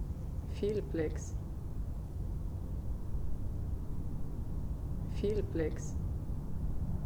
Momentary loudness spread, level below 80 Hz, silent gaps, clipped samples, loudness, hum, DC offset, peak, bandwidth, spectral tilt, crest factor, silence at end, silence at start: 7 LU; -40 dBFS; none; under 0.1%; -39 LUFS; none; under 0.1%; -22 dBFS; 20 kHz; -7.5 dB/octave; 14 dB; 0 s; 0 s